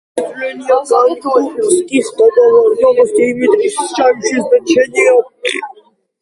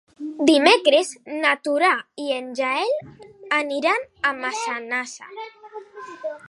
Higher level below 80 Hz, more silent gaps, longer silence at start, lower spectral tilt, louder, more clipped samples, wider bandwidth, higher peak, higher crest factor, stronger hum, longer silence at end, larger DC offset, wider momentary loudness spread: first, -58 dBFS vs -70 dBFS; neither; about the same, 0.15 s vs 0.2 s; about the same, -3 dB/octave vs -2 dB/octave; first, -12 LUFS vs -21 LUFS; neither; about the same, 11.5 kHz vs 11.5 kHz; about the same, 0 dBFS vs -2 dBFS; second, 12 dB vs 20 dB; neither; first, 0.5 s vs 0 s; neither; second, 10 LU vs 21 LU